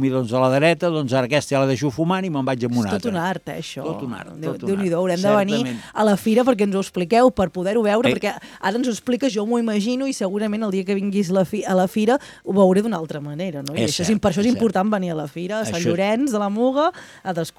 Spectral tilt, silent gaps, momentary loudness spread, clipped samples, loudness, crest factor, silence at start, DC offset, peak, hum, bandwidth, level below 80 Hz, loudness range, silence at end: -6 dB/octave; none; 10 LU; under 0.1%; -21 LUFS; 18 dB; 0 s; under 0.1%; -2 dBFS; none; 15.5 kHz; -54 dBFS; 3 LU; 0.1 s